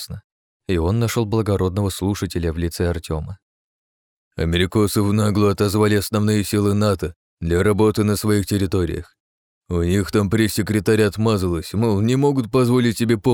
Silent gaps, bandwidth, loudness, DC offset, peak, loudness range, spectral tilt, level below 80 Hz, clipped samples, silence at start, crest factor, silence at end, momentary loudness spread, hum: 0.24-0.60 s, 3.42-4.31 s, 7.16-7.37 s, 9.20-9.62 s; 19 kHz; -19 LUFS; under 0.1%; -4 dBFS; 4 LU; -6 dB/octave; -38 dBFS; under 0.1%; 0 s; 16 dB; 0 s; 9 LU; none